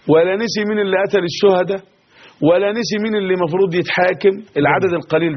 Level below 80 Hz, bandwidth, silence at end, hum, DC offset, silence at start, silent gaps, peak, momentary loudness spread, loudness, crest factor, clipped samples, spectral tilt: -58 dBFS; 6.4 kHz; 0 s; none; under 0.1%; 0.05 s; none; 0 dBFS; 4 LU; -16 LUFS; 16 dB; under 0.1%; -4 dB/octave